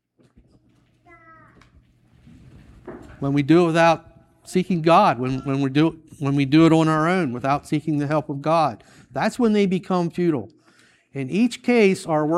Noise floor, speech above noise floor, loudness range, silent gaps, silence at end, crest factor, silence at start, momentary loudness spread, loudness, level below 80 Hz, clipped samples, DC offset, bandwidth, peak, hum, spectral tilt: -59 dBFS; 40 dB; 4 LU; none; 0 s; 18 dB; 2.85 s; 13 LU; -20 LUFS; -56 dBFS; under 0.1%; under 0.1%; 12.5 kHz; -4 dBFS; none; -7 dB/octave